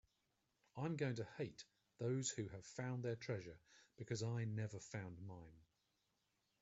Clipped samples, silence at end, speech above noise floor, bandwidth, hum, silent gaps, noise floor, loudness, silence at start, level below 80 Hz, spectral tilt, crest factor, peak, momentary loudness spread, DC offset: under 0.1%; 1 s; 40 dB; 8 kHz; none; none; -86 dBFS; -47 LUFS; 0.75 s; -78 dBFS; -5.5 dB/octave; 20 dB; -28 dBFS; 17 LU; under 0.1%